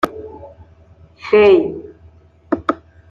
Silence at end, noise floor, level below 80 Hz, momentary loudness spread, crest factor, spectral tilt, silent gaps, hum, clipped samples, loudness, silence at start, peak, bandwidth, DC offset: 0.35 s; -46 dBFS; -50 dBFS; 23 LU; 16 dB; -6.5 dB/octave; none; none; under 0.1%; -15 LUFS; 0.05 s; -2 dBFS; 7.2 kHz; under 0.1%